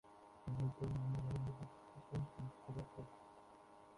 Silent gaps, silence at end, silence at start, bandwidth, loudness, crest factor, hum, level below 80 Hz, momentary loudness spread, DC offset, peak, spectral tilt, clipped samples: none; 0 s; 0.05 s; 11 kHz; -47 LUFS; 14 dB; none; -64 dBFS; 19 LU; under 0.1%; -32 dBFS; -8.5 dB/octave; under 0.1%